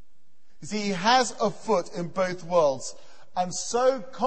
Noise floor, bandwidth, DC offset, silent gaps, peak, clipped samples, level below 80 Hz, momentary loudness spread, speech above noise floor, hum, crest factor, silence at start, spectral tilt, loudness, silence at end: -71 dBFS; 8.8 kHz; 1%; none; -8 dBFS; under 0.1%; -60 dBFS; 13 LU; 45 dB; none; 18 dB; 0.6 s; -3.5 dB/octave; -26 LUFS; 0 s